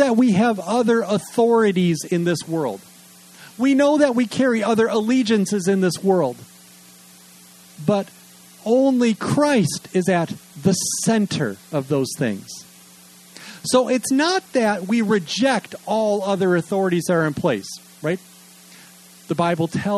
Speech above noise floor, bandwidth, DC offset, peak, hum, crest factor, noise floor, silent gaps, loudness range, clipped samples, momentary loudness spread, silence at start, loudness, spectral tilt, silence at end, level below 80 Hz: 27 dB; 13 kHz; under 0.1%; -4 dBFS; none; 16 dB; -47 dBFS; none; 4 LU; under 0.1%; 11 LU; 0 s; -20 LUFS; -5 dB/octave; 0 s; -62 dBFS